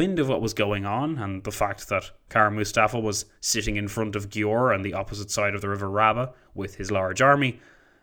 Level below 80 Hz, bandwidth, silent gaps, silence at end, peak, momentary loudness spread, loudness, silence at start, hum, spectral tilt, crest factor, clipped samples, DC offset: -46 dBFS; over 20 kHz; none; 0.45 s; -4 dBFS; 9 LU; -25 LUFS; 0 s; none; -4.5 dB/octave; 20 dB; under 0.1%; under 0.1%